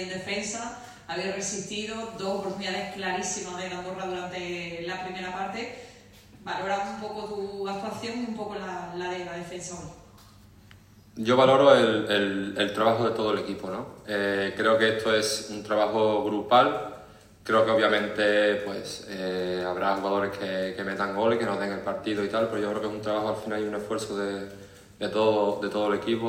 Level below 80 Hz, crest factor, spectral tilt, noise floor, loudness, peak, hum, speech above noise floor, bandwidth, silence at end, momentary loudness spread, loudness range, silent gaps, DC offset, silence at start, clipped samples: -62 dBFS; 24 dB; -4 dB/octave; -53 dBFS; -27 LUFS; -4 dBFS; none; 26 dB; 16 kHz; 0 s; 13 LU; 10 LU; none; under 0.1%; 0 s; under 0.1%